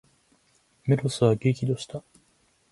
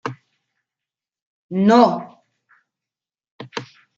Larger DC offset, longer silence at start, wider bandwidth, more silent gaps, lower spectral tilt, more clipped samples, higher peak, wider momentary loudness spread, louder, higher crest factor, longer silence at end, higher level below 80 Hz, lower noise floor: neither; first, 0.85 s vs 0.05 s; first, 11.5 kHz vs 7.6 kHz; second, none vs 1.22-1.49 s, 3.31-3.39 s; about the same, -7 dB/octave vs -7 dB/octave; neither; second, -8 dBFS vs -2 dBFS; second, 15 LU vs 19 LU; second, -25 LUFS vs -16 LUFS; about the same, 20 dB vs 20 dB; first, 0.7 s vs 0.35 s; first, -60 dBFS vs -70 dBFS; second, -66 dBFS vs -90 dBFS